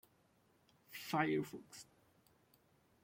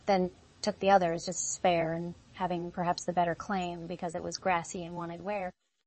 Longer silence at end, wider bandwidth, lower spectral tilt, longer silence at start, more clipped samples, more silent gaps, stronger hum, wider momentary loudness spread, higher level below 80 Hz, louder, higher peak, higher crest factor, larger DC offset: first, 1.2 s vs 0.35 s; first, 16.5 kHz vs 8.8 kHz; about the same, -5.5 dB/octave vs -4.5 dB/octave; first, 0.9 s vs 0.05 s; neither; neither; neither; first, 20 LU vs 12 LU; second, -84 dBFS vs -62 dBFS; second, -40 LUFS vs -32 LUFS; second, -24 dBFS vs -10 dBFS; about the same, 22 dB vs 22 dB; neither